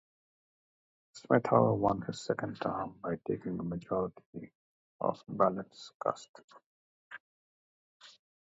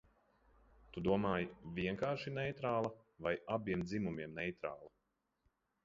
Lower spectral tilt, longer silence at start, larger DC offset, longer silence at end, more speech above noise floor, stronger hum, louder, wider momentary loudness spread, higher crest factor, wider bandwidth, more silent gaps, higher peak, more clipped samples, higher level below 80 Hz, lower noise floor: about the same, -6.5 dB/octave vs -5.5 dB/octave; first, 1.15 s vs 0.9 s; neither; second, 0.35 s vs 0.95 s; first, over 57 dB vs 45 dB; neither; first, -33 LUFS vs -40 LUFS; first, 24 LU vs 8 LU; about the same, 24 dB vs 22 dB; about the same, 7.6 kHz vs 7.4 kHz; first, 4.26-4.33 s, 4.55-4.99 s, 5.94-6.00 s, 6.29-6.34 s, 6.44-6.48 s, 6.66-7.10 s, 7.20-8.00 s vs none; first, -10 dBFS vs -20 dBFS; neither; about the same, -66 dBFS vs -64 dBFS; first, under -90 dBFS vs -84 dBFS